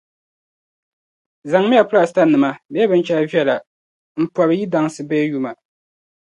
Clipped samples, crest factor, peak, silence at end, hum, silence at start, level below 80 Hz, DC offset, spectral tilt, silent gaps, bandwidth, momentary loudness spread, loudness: under 0.1%; 18 dB; 0 dBFS; 0.85 s; none; 1.45 s; -68 dBFS; under 0.1%; -6.5 dB/octave; 2.65-2.69 s, 3.67-4.15 s; 11 kHz; 11 LU; -17 LUFS